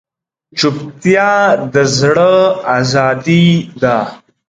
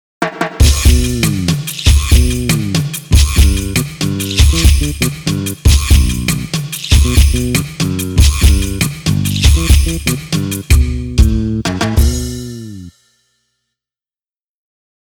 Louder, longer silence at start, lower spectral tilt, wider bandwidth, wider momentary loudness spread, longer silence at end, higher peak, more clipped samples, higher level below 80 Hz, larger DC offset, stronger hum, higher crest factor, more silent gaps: about the same, -12 LUFS vs -13 LUFS; first, 0.55 s vs 0.2 s; about the same, -5.5 dB/octave vs -4.5 dB/octave; second, 9.2 kHz vs 19 kHz; about the same, 6 LU vs 8 LU; second, 0.35 s vs 2.15 s; about the same, 0 dBFS vs 0 dBFS; neither; second, -50 dBFS vs -14 dBFS; neither; neither; about the same, 12 dB vs 12 dB; neither